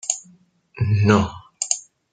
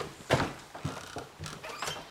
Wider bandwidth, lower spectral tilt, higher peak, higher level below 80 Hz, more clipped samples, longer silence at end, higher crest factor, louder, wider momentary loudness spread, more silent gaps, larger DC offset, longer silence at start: second, 9.6 kHz vs 17 kHz; about the same, -5 dB/octave vs -4.5 dB/octave; first, -2 dBFS vs -12 dBFS; first, -50 dBFS vs -56 dBFS; neither; first, 0.35 s vs 0 s; about the same, 20 dB vs 24 dB; first, -21 LUFS vs -35 LUFS; about the same, 12 LU vs 12 LU; neither; neither; about the same, 0.05 s vs 0 s